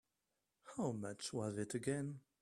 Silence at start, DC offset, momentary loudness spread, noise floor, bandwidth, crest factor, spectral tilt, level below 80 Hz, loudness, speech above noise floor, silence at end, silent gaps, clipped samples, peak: 0.65 s; under 0.1%; 5 LU; -88 dBFS; 13.5 kHz; 20 dB; -5.5 dB/octave; -78 dBFS; -44 LUFS; 46 dB; 0.2 s; none; under 0.1%; -26 dBFS